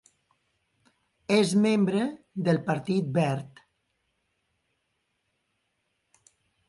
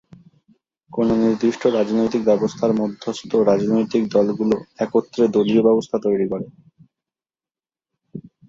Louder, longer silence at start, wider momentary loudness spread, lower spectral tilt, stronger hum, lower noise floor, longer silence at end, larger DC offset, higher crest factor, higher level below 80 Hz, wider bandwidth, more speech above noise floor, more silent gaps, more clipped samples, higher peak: second, -26 LUFS vs -19 LUFS; first, 1.3 s vs 0.9 s; about the same, 11 LU vs 12 LU; about the same, -6.5 dB/octave vs -7 dB/octave; neither; second, -77 dBFS vs under -90 dBFS; first, 3.2 s vs 0.3 s; neither; about the same, 20 dB vs 16 dB; second, -70 dBFS vs -58 dBFS; first, 11.5 kHz vs 7.6 kHz; second, 52 dB vs over 72 dB; neither; neither; second, -10 dBFS vs -4 dBFS